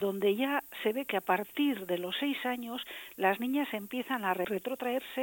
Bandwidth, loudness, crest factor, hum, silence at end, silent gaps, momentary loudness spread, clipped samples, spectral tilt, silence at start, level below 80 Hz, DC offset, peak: 17 kHz; -33 LUFS; 20 dB; none; 0 s; none; 6 LU; under 0.1%; -4.5 dB/octave; 0 s; -76 dBFS; under 0.1%; -12 dBFS